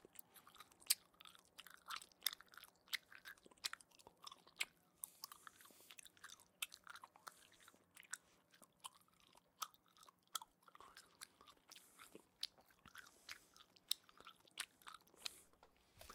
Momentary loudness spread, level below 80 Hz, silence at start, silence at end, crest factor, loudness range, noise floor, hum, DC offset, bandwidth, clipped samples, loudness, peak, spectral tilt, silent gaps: 19 LU; -88 dBFS; 0 s; 0 s; 40 dB; 9 LU; -73 dBFS; none; under 0.1%; 16.5 kHz; under 0.1%; -51 LUFS; -14 dBFS; 1.5 dB/octave; none